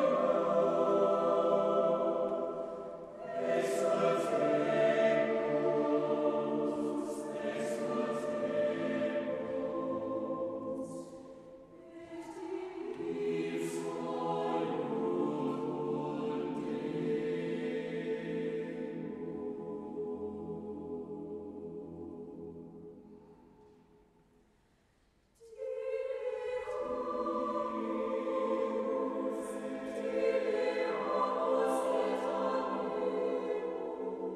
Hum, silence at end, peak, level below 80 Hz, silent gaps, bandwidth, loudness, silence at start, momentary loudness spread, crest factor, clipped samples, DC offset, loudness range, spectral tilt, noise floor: none; 0 s; -16 dBFS; -72 dBFS; none; 13 kHz; -34 LUFS; 0 s; 15 LU; 18 dB; under 0.1%; under 0.1%; 12 LU; -6 dB/octave; -70 dBFS